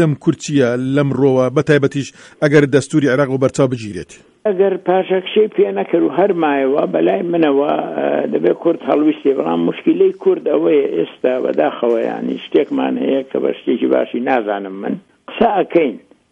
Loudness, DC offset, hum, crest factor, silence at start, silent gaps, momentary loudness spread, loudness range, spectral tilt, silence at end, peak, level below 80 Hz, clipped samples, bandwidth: -16 LUFS; under 0.1%; none; 16 dB; 0 s; none; 7 LU; 3 LU; -6.5 dB/octave; 0.35 s; 0 dBFS; -56 dBFS; under 0.1%; 10.5 kHz